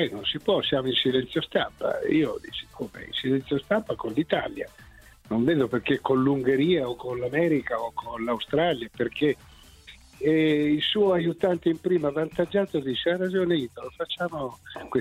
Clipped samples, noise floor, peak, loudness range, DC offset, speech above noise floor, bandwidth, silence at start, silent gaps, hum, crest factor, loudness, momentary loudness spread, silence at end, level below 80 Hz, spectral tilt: under 0.1%; -50 dBFS; -8 dBFS; 3 LU; under 0.1%; 24 dB; 15 kHz; 0 s; none; none; 18 dB; -26 LUFS; 11 LU; 0 s; -56 dBFS; -6.5 dB/octave